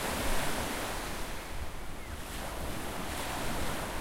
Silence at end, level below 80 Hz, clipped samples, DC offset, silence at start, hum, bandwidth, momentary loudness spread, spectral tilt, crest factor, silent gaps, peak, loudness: 0 s; -40 dBFS; under 0.1%; under 0.1%; 0 s; none; 16 kHz; 9 LU; -3.5 dB/octave; 16 dB; none; -18 dBFS; -37 LUFS